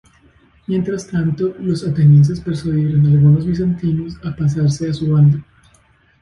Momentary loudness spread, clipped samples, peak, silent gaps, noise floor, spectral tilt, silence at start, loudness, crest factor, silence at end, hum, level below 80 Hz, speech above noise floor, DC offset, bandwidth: 11 LU; under 0.1%; -2 dBFS; none; -54 dBFS; -8.5 dB/octave; 0.7 s; -16 LUFS; 12 dB; 0.8 s; none; -42 dBFS; 39 dB; under 0.1%; 9.2 kHz